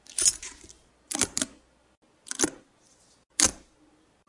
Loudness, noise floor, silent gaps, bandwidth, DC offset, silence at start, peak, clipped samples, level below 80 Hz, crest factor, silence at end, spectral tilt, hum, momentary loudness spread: -27 LUFS; -62 dBFS; 1.97-2.02 s; 11.5 kHz; under 0.1%; 0.1 s; -2 dBFS; under 0.1%; -56 dBFS; 30 dB; 0.7 s; -0.5 dB/octave; none; 14 LU